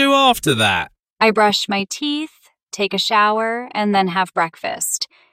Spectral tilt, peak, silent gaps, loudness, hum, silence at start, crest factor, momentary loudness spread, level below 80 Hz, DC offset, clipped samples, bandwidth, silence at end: -3 dB/octave; 0 dBFS; 1.10-1.16 s, 2.63-2.67 s; -17 LUFS; none; 0 s; 18 dB; 9 LU; -54 dBFS; under 0.1%; under 0.1%; 16 kHz; 0.25 s